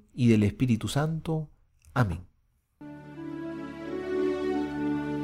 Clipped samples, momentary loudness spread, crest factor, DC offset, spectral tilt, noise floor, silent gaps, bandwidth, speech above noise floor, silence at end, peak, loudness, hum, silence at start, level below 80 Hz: under 0.1%; 19 LU; 18 dB; under 0.1%; -7 dB/octave; -69 dBFS; none; 16 kHz; 44 dB; 0 s; -10 dBFS; -29 LUFS; none; 0.15 s; -52 dBFS